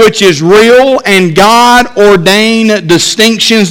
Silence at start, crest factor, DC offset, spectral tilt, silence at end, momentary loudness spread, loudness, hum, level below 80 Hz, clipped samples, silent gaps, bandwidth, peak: 0 s; 4 dB; under 0.1%; -3.5 dB/octave; 0 s; 4 LU; -5 LUFS; none; -38 dBFS; 7%; none; 17 kHz; 0 dBFS